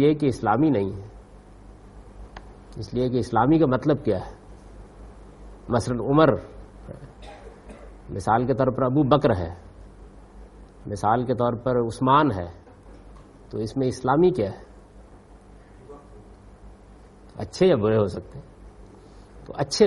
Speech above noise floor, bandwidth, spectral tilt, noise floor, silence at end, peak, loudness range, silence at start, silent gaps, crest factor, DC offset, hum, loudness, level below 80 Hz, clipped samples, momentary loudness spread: 26 dB; 11.5 kHz; -7 dB/octave; -48 dBFS; 0 s; -2 dBFS; 3 LU; 0 s; none; 24 dB; under 0.1%; 50 Hz at -50 dBFS; -23 LUFS; -46 dBFS; under 0.1%; 25 LU